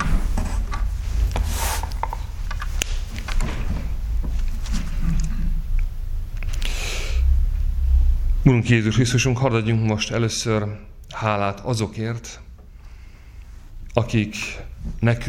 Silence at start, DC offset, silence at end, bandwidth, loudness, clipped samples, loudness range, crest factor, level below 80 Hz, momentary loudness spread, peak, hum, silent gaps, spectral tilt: 0 s; under 0.1%; 0 s; 17 kHz; -24 LUFS; under 0.1%; 8 LU; 22 dB; -24 dBFS; 13 LU; 0 dBFS; none; none; -5.5 dB/octave